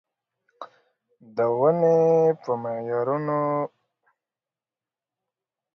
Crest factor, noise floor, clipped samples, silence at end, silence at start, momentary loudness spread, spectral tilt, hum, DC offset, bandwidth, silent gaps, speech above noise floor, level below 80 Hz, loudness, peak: 16 dB; under -90 dBFS; under 0.1%; 2.1 s; 0.6 s; 25 LU; -9.5 dB/octave; none; under 0.1%; 6.2 kHz; none; over 68 dB; -76 dBFS; -23 LUFS; -10 dBFS